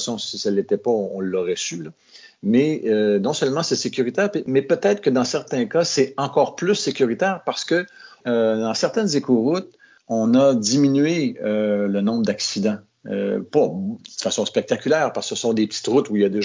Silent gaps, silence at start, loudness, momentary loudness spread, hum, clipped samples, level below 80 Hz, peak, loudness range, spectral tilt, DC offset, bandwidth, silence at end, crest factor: none; 0 s; -21 LUFS; 7 LU; none; under 0.1%; -66 dBFS; -4 dBFS; 3 LU; -4.5 dB/octave; under 0.1%; 7.6 kHz; 0 s; 16 dB